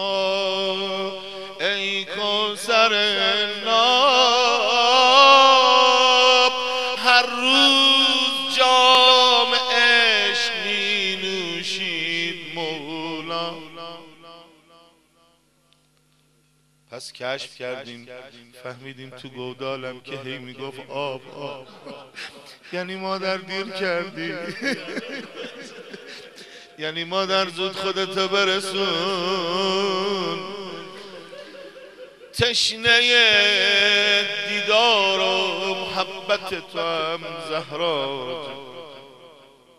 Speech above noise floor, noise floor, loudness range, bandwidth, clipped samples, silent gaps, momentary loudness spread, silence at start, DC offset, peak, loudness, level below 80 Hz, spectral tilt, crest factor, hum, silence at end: 39 dB; -62 dBFS; 19 LU; 13.5 kHz; under 0.1%; none; 23 LU; 0 s; 0.2%; 0 dBFS; -18 LUFS; -64 dBFS; -2 dB/octave; 22 dB; none; 0.5 s